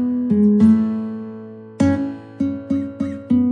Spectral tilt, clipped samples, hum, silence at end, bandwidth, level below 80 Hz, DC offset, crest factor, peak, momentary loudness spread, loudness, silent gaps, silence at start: -9 dB/octave; under 0.1%; none; 0 s; 9 kHz; -52 dBFS; under 0.1%; 14 dB; -4 dBFS; 17 LU; -19 LUFS; none; 0 s